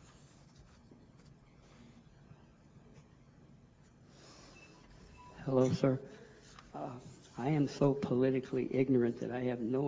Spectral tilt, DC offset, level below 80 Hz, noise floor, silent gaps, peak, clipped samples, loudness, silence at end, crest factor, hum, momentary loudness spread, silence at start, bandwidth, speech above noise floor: -8 dB/octave; under 0.1%; -66 dBFS; -62 dBFS; none; -14 dBFS; under 0.1%; -34 LUFS; 0 s; 22 dB; none; 25 LU; 0.6 s; 7.8 kHz; 29 dB